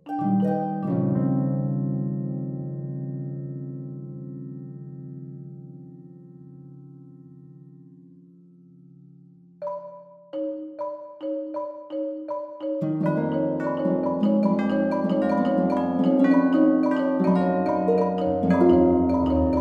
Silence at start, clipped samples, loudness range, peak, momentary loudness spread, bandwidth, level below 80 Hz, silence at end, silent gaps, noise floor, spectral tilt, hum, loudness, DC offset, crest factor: 0.05 s; under 0.1%; 21 LU; -8 dBFS; 19 LU; 5.2 kHz; -50 dBFS; 0 s; none; -51 dBFS; -10 dB/octave; none; -24 LUFS; under 0.1%; 18 dB